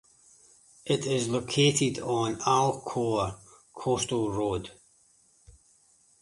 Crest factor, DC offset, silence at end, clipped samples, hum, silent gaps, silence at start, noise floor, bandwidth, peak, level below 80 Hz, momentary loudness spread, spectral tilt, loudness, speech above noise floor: 20 dB; under 0.1%; 1.5 s; under 0.1%; none; none; 0.85 s; -63 dBFS; 11.5 kHz; -10 dBFS; -58 dBFS; 12 LU; -4.5 dB/octave; -28 LUFS; 36 dB